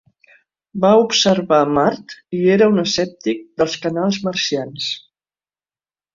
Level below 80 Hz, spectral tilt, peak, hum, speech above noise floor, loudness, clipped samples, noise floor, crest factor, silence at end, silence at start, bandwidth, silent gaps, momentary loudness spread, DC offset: -56 dBFS; -4.5 dB/octave; -2 dBFS; none; over 73 dB; -17 LUFS; under 0.1%; under -90 dBFS; 16 dB; 1.15 s; 0.75 s; 7.6 kHz; none; 11 LU; under 0.1%